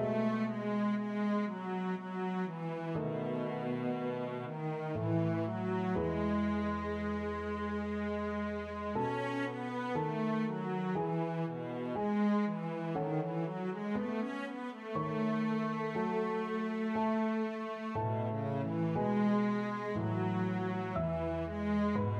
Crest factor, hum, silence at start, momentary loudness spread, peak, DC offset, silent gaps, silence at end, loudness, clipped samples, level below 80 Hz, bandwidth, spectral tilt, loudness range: 14 dB; none; 0 s; 6 LU; -20 dBFS; under 0.1%; none; 0 s; -35 LUFS; under 0.1%; -58 dBFS; 7.4 kHz; -8.5 dB/octave; 2 LU